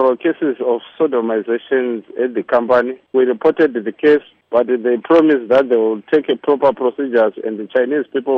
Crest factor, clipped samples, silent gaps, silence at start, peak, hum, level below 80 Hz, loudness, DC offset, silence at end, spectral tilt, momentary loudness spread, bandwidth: 12 dB; under 0.1%; none; 0 s; -2 dBFS; none; -62 dBFS; -16 LUFS; under 0.1%; 0 s; -7.5 dB/octave; 6 LU; 5.8 kHz